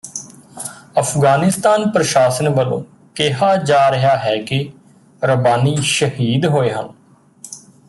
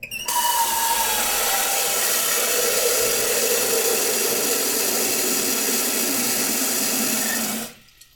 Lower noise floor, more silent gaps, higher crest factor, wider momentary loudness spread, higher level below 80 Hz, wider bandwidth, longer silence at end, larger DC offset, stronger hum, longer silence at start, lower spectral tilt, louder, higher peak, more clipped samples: about the same, -42 dBFS vs -44 dBFS; neither; about the same, 14 dB vs 16 dB; first, 17 LU vs 2 LU; about the same, -56 dBFS vs -56 dBFS; second, 12.5 kHz vs 19.5 kHz; about the same, 0.3 s vs 0.4 s; neither; neither; about the same, 0.05 s vs 0 s; first, -5 dB/octave vs 0 dB/octave; first, -15 LUFS vs -19 LUFS; first, -2 dBFS vs -6 dBFS; neither